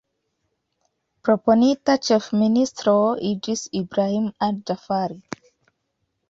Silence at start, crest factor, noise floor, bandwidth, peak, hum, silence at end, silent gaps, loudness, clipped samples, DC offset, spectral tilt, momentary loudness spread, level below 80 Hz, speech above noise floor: 1.25 s; 18 dB; -75 dBFS; 7.8 kHz; -4 dBFS; none; 1.1 s; none; -21 LUFS; under 0.1%; under 0.1%; -5.5 dB/octave; 11 LU; -62 dBFS; 54 dB